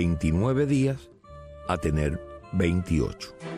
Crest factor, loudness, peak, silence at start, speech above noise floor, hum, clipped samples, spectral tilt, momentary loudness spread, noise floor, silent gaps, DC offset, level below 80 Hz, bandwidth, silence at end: 16 dB; -26 LUFS; -12 dBFS; 0 s; 20 dB; none; under 0.1%; -7.5 dB/octave; 15 LU; -45 dBFS; none; under 0.1%; -38 dBFS; 13.5 kHz; 0 s